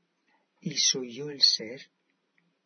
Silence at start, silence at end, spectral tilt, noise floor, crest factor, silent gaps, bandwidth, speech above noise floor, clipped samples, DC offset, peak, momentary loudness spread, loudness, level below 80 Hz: 0.65 s; 0.8 s; -1 dB/octave; -73 dBFS; 22 dB; none; 6.6 kHz; 45 dB; under 0.1%; under 0.1%; -8 dBFS; 19 LU; -24 LUFS; -88 dBFS